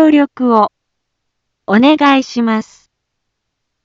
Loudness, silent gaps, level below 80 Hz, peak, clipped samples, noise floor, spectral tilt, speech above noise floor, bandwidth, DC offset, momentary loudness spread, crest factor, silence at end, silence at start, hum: -12 LUFS; none; -60 dBFS; 0 dBFS; under 0.1%; -72 dBFS; -5.5 dB/octave; 61 dB; 7.6 kHz; under 0.1%; 9 LU; 14 dB; 1.2 s; 0 s; none